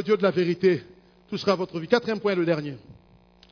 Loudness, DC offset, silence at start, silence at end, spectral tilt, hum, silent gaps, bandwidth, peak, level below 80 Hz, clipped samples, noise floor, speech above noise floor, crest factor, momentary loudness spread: -25 LUFS; under 0.1%; 0 s; 0.6 s; -7 dB/octave; none; none; 5.4 kHz; -4 dBFS; -64 dBFS; under 0.1%; -55 dBFS; 32 dB; 20 dB; 10 LU